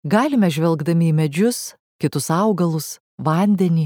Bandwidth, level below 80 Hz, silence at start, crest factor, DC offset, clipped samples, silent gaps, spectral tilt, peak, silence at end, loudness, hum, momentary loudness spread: 17.5 kHz; -66 dBFS; 0.05 s; 16 dB; under 0.1%; under 0.1%; 1.80-1.99 s, 3.00-3.18 s; -6.5 dB/octave; -2 dBFS; 0 s; -19 LUFS; none; 9 LU